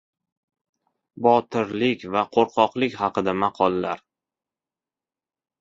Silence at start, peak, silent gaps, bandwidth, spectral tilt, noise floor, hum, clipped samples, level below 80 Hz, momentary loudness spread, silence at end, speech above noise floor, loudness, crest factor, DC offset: 1.15 s; -2 dBFS; none; 7.6 kHz; -6.5 dB/octave; under -90 dBFS; none; under 0.1%; -62 dBFS; 7 LU; 1.65 s; over 68 dB; -22 LUFS; 22 dB; under 0.1%